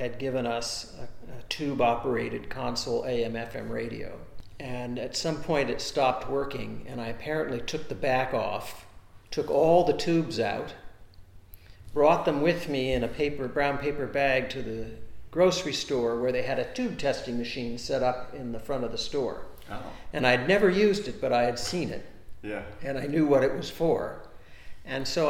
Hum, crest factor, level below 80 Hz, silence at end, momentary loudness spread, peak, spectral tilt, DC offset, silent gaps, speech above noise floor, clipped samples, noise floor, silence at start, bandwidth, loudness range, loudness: none; 22 dB; -48 dBFS; 0 s; 15 LU; -6 dBFS; -5 dB/octave; under 0.1%; none; 21 dB; under 0.1%; -49 dBFS; 0 s; 17.5 kHz; 5 LU; -28 LUFS